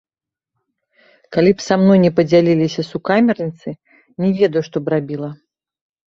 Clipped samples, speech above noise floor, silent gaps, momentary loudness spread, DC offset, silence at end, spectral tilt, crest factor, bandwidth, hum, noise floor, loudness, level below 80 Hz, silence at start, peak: under 0.1%; 72 dB; none; 14 LU; under 0.1%; 0.8 s; -7 dB/octave; 16 dB; 7.4 kHz; none; -87 dBFS; -16 LUFS; -56 dBFS; 1.3 s; -2 dBFS